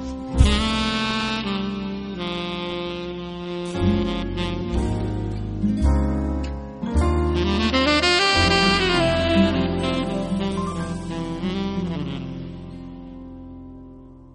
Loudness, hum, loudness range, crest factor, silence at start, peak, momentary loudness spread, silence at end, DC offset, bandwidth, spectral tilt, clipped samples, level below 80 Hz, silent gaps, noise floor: -22 LUFS; none; 9 LU; 22 dB; 0 s; -2 dBFS; 18 LU; 0 s; under 0.1%; 10.5 kHz; -5.5 dB/octave; under 0.1%; -30 dBFS; none; -43 dBFS